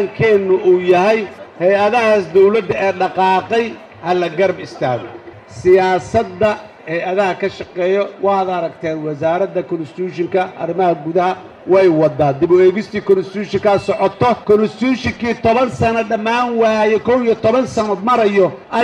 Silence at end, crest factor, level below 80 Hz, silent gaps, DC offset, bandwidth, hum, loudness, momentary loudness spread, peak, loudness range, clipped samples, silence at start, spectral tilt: 0 s; 14 dB; -48 dBFS; none; under 0.1%; 9.4 kHz; none; -15 LUFS; 10 LU; 0 dBFS; 4 LU; under 0.1%; 0 s; -6.5 dB/octave